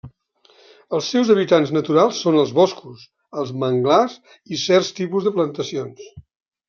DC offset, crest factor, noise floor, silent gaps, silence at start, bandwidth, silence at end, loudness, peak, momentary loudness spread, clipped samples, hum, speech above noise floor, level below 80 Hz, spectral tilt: under 0.1%; 18 dB; -56 dBFS; none; 0.05 s; 7.2 kHz; 0.5 s; -19 LUFS; -2 dBFS; 13 LU; under 0.1%; none; 38 dB; -62 dBFS; -5.5 dB/octave